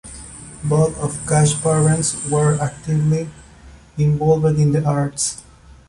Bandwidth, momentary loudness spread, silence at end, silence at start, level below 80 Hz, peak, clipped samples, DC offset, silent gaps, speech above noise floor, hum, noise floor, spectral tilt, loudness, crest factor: 11.5 kHz; 17 LU; 0.5 s; 0.05 s; -44 dBFS; -4 dBFS; under 0.1%; under 0.1%; none; 26 dB; none; -43 dBFS; -6 dB/octave; -18 LUFS; 14 dB